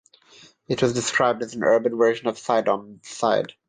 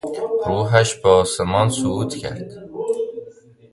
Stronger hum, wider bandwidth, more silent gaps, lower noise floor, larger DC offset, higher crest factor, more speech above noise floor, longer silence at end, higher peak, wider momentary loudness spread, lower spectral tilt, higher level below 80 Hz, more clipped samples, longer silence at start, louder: neither; second, 9.6 kHz vs 11.5 kHz; neither; first, -52 dBFS vs -43 dBFS; neither; about the same, 16 dB vs 20 dB; first, 30 dB vs 25 dB; second, 0.2 s vs 0.4 s; second, -6 dBFS vs 0 dBFS; second, 7 LU vs 15 LU; about the same, -4 dB/octave vs -5 dB/octave; second, -64 dBFS vs -44 dBFS; neither; first, 0.7 s vs 0.05 s; second, -22 LUFS vs -19 LUFS